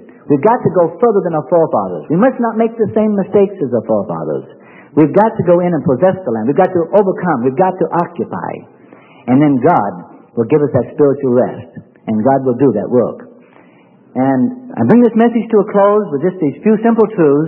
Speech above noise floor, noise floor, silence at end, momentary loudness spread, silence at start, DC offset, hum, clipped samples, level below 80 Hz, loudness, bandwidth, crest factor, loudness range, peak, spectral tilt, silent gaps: 33 dB; -45 dBFS; 0 s; 10 LU; 0.25 s; under 0.1%; none; under 0.1%; -58 dBFS; -13 LUFS; 3.3 kHz; 12 dB; 3 LU; 0 dBFS; -11.5 dB/octave; none